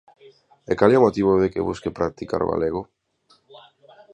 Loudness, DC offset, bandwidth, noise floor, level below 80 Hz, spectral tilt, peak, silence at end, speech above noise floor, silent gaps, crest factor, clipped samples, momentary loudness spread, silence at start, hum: -21 LUFS; under 0.1%; 9 kHz; -61 dBFS; -48 dBFS; -7.5 dB/octave; -2 dBFS; 0.55 s; 41 dB; none; 22 dB; under 0.1%; 11 LU; 0.7 s; none